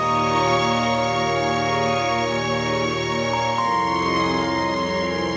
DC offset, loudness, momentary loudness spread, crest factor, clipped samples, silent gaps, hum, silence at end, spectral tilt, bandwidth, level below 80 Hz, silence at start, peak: under 0.1%; -21 LUFS; 3 LU; 14 dB; under 0.1%; none; none; 0 s; -4.5 dB/octave; 8 kHz; -44 dBFS; 0 s; -8 dBFS